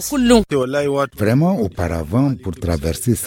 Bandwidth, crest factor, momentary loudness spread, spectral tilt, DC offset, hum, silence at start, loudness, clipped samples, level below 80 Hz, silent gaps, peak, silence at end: 17 kHz; 16 dB; 8 LU; -6 dB/octave; under 0.1%; none; 0 s; -18 LUFS; under 0.1%; -34 dBFS; none; 0 dBFS; 0 s